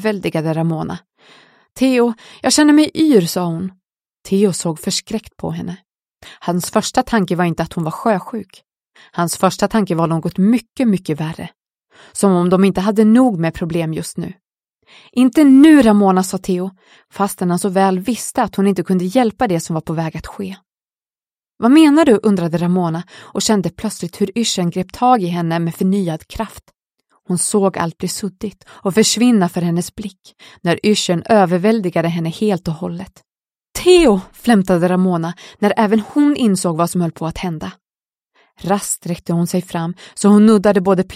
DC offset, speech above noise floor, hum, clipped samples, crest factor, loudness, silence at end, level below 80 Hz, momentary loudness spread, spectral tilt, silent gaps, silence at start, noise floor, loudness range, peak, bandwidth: under 0.1%; over 75 dB; none; under 0.1%; 16 dB; -15 LUFS; 0 s; -46 dBFS; 16 LU; -5.5 dB/octave; none; 0 s; under -90 dBFS; 6 LU; 0 dBFS; 16 kHz